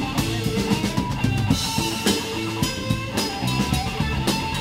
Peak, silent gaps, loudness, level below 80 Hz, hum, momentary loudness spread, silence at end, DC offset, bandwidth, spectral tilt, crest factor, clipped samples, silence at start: -6 dBFS; none; -23 LUFS; -36 dBFS; none; 3 LU; 0 s; under 0.1%; 16 kHz; -4.5 dB/octave; 18 dB; under 0.1%; 0 s